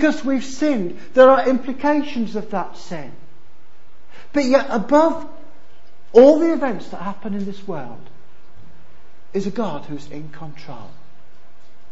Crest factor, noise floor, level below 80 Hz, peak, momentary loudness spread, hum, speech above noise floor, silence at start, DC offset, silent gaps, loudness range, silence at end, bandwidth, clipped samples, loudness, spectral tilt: 20 dB; -54 dBFS; -54 dBFS; 0 dBFS; 24 LU; none; 36 dB; 0 s; 6%; none; 14 LU; 1.05 s; 8 kHz; under 0.1%; -18 LUFS; -6 dB/octave